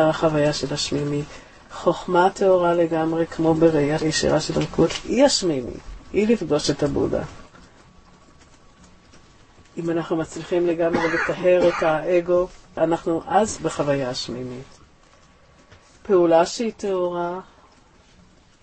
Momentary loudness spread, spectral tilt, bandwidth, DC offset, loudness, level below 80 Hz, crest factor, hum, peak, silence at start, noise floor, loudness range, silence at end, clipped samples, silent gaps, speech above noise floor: 12 LU; -5 dB/octave; 8.8 kHz; under 0.1%; -21 LUFS; -46 dBFS; 18 dB; none; -4 dBFS; 0 s; -53 dBFS; 7 LU; 1.2 s; under 0.1%; none; 32 dB